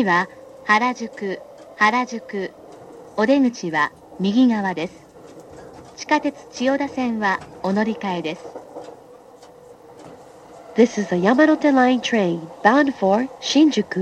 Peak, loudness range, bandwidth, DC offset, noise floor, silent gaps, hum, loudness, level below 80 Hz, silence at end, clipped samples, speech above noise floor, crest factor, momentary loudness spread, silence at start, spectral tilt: -2 dBFS; 8 LU; 9.2 kHz; under 0.1%; -45 dBFS; none; none; -20 LUFS; -62 dBFS; 0 s; under 0.1%; 26 dB; 20 dB; 17 LU; 0 s; -5 dB/octave